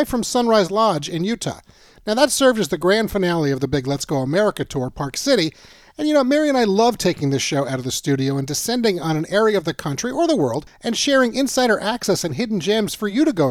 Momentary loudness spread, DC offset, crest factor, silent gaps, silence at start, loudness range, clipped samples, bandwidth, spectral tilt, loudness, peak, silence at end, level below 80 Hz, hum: 8 LU; under 0.1%; 18 dB; none; 0 s; 2 LU; under 0.1%; 17.5 kHz; -4.5 dB/octave; -19 LUFS; -2 dBFS; 0 s; -48 dBFS; none